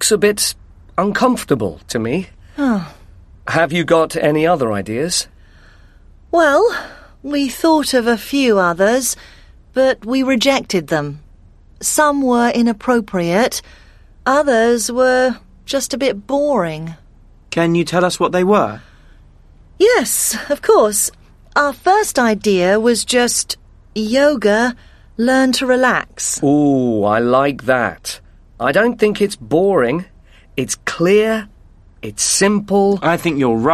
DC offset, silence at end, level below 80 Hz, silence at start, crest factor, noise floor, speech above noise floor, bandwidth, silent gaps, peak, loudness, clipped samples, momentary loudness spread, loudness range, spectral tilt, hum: under 0.1%; 0 s; -44 dBFS; 0 s; 16 dB; -44 dBFS; 30 dB; 13.5 kHz; none; 0 dBFS; -15 LUFS; under 0.1%; 10 LU; 3 LU; -4 dB/octave; none